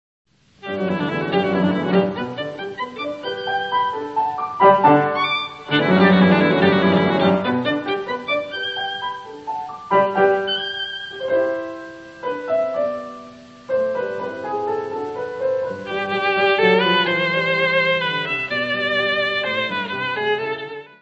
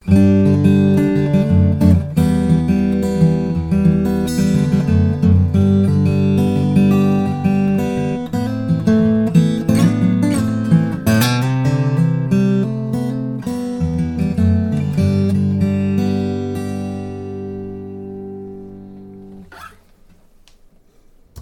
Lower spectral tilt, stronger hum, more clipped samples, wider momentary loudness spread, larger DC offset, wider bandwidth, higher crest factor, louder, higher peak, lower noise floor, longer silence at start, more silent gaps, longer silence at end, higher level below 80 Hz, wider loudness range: about the same, -7 dB/octave vs -8 dB/octave; neither; neither; about the same, 13 LU vs 14 LU; neither; second, 7.8 kHz vs 17 kHz; about the same, 20 dB vs 16 dB; second, -20 LUFS vs -16 LUFS; about the same, 0 dBFS vs 0 dBFS; second, -41 dBFS vs -48 dBFS; first, 0.65 s vs 0.05 s; neither; first, 0.15 s vs 0 s; second, -60 dBFS vs -36 dBFS; second, 8 LU vs 12 LU